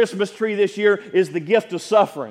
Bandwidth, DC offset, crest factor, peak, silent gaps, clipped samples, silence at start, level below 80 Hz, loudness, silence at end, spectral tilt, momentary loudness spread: 13.5 kHz; under 0.1%; 18 dB; -2 dBFS; none; under 0.1%; 0 s; -74 dBFS; -20 LUFS; 0 s; -5 dB/octave; 3 LU